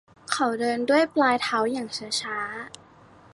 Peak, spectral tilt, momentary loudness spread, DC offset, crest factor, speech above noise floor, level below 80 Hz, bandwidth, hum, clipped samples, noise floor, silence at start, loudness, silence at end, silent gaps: -8 dBFS; -3 dB/octave; 10 LU; under 0.1%; 18 dB; 27 dB; -68 dBFS; 11.5 kHz; none; under 0.1%; -52 dBFS; 0.3 s; -25 LUFS; 0.65 s; none